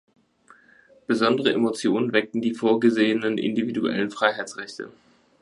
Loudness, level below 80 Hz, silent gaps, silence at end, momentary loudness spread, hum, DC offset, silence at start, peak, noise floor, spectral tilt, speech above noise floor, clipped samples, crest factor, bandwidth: -23 LUFS; -70 dBFS; none; 0.55 s; 15 LU; none; under 0.1%; 1.1 s; -4 dBFS; -56 dBFS; -5 dB/octave; 33 dB; under 0.1%; 20 dB; 11.5 kHz